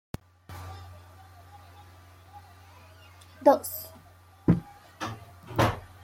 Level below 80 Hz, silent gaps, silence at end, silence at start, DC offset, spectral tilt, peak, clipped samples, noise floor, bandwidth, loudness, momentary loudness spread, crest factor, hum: -52 dBFS; none; 0.2 s; 0.5 s; under 0.1%; -6.5 dB/octave; -8 dBFS; under 0.1%; -54 dBFS; 16.5 kHz; -28 LUFS; 28 LU; 24 dB; none